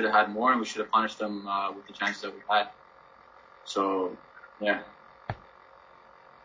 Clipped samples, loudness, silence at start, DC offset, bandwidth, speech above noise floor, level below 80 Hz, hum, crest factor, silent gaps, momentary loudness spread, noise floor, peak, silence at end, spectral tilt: under 0.1%; -29 LUFS; 0 s; under 0.1%; 7.8 kHz; 27 dB; -66 dBFS; none; 22 dB; none; 17 LU; -55 dBFS; -10 dBFS; 1.05 s; -4 dB/octave